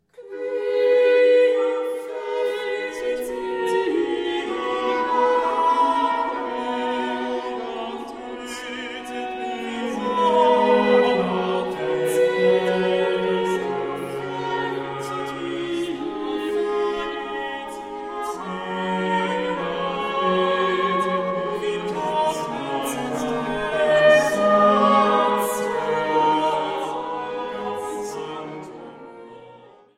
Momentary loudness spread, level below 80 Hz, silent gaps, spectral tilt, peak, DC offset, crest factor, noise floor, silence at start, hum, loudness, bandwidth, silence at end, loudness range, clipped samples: 13 LU; -58 dBFS; none; -5 dB/octave; -4 dBFS; under 0.1%; 18 dB; -47 dBFS; 0.2 s; none; -22 LUFS; 15.5 kHz; 0.35 s; 8 LU; under 0.1%